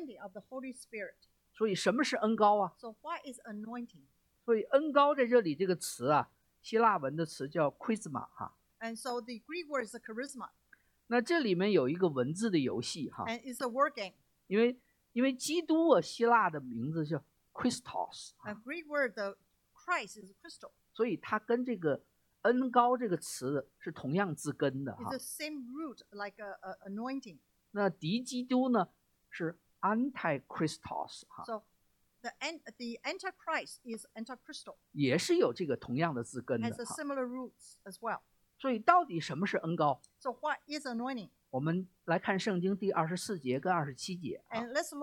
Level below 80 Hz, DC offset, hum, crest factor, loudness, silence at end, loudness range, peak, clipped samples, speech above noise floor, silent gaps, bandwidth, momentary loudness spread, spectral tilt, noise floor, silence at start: -76 dBFS; under 0.1%; none; 24 dB; -34 LUFS; 0 s; 8 LU; -10 dBFS; under 0.1%; 40 dB; none; 17 kHz; 17 LU; -5 dB/octave; -74 dBFS; 0 s